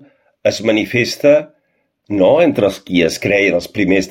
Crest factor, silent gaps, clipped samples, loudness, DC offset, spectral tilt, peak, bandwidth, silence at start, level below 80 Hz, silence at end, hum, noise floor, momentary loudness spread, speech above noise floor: 14 dB; none; under 0.1%; -14 LUFS; under 0.1%; -5 dB/octave; 0 dBFS; 16.5 kHz; 0.45 s; -48 dBFS; 0 s; none; -65 dBFS; 6 LU; 51 dB